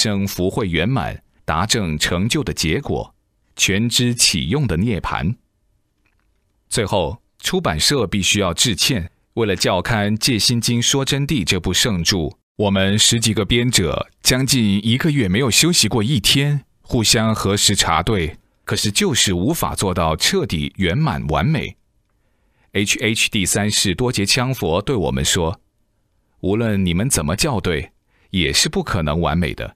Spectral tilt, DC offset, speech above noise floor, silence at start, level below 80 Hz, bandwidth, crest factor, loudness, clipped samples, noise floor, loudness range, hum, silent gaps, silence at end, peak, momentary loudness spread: -3.5 dB/octave; under 0.1%; 46 dB; 0 s; -36 dBFS; 16 kHz; 18 dB; -17 LUFS; under 0.1%; -64 dBFS; 5 LU; none; 12.43-12.55 s; 0.05 s; 0 dBFS; 9 LU